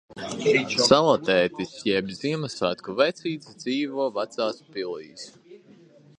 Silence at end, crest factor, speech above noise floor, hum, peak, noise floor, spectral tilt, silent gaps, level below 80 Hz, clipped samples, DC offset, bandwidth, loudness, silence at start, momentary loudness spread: 0.6 s; 24 dB; 28 dB; none; -2 dBFS; -52 dBFS; -4 dB/octave; none; -62 dBFS; under 0.1%; under 0.1%; 10.5 kHz; -24 LUFS; 0.1 s; 15 LU